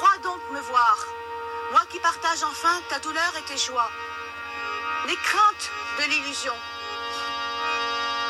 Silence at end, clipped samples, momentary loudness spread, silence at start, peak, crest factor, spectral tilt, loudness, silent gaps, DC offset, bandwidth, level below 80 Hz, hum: 0 s; under 0.1%; 12 LU; 0 s; -8 dBFS; 18 dB; -0.5 dB/octave; -25 LUFS; none; under 0.1%; 15.5 kHz; -62 dBFS; none